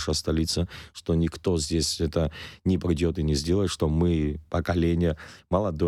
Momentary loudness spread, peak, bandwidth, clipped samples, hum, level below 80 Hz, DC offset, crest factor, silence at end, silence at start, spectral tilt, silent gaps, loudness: 5 LU; -10 dBFS; 13.5 kHz; under 0.1%; none; -36 dBFS; under 0.1%; 14 dB; 0 s; 0 s; -5.5 dB/octave; none; -26 LUFS